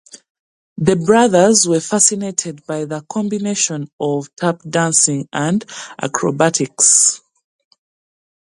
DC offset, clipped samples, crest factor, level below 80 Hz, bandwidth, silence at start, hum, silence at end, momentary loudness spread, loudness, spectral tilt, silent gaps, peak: under 0.1%; under 0.1%; 18 dB; -58 dBFS; 11.5 kHz; 0.15 s; none; 1.35 s; 13 LU; -15 LUFS; -3.5 dB/octave; 0.30-0.76 s, 3.93-3.99 s; 0 dBFS